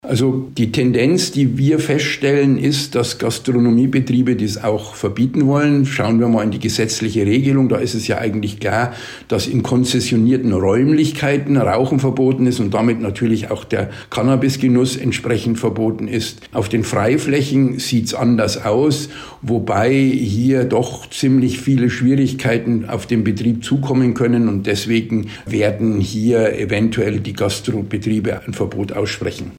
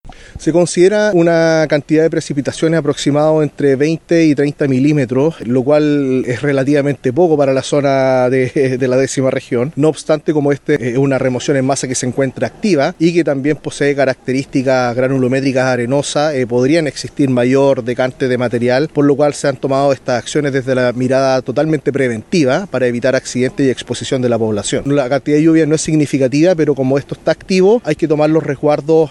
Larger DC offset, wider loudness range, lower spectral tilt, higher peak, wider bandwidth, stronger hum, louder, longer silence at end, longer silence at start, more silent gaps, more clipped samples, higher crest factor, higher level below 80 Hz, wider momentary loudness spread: neither; about the same, 2 LU vs 2 LU; about the same, -6 dB/octave vs -6 dB/octave; second, -6 dBFS vs 0 dBFS; first, 16 kHz vs 12 kHz; neither; second, -17 LUFS vs -14 LUFS; about the same, 0 s vs 0 s; about the same, 0.05 s vs 0.05 s; neither; neither; about the same, 10 dB vs 14 dB; about the same, -48 dBFS vs -46 dBFS; about the same, 7 LU vs 5 LU